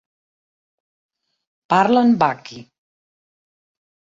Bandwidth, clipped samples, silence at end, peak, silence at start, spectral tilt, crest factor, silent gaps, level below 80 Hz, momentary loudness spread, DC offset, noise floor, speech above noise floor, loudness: 7.6 kHz; under 0.1%; 1.5 s; -2 dBFS; 1.7 s; -6.5 dB/octave; 20 dB; none; -64 dBFS; 18 LU; under 0.1%; under -90 dBFS; over 74 dB; -16 LUFS